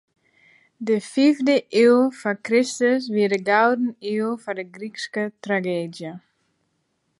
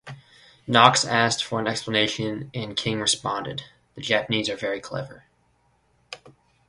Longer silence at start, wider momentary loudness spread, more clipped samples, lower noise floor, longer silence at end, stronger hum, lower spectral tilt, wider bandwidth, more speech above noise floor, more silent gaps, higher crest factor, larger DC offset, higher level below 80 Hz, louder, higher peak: first, 0.8 s vs 0.05 s; second, 15 LU vs 25 LU; neither; first, -71 dBFS vs -65 dBFS; first, 1 s vs 0.4 s; neither; first, -5 dB/octave vs -3 dB/octave; about the same, 11.5 kHz vs 11.5 kHz; first, 51 dB vs 41 dB; neither; second, 18 dB vs 26 dB; neither; second, -76 dBFS vs -60 dBFS; about the same, -21 LUFS vs -23 LUFS; second, -4 dBFS vs 0 dBFS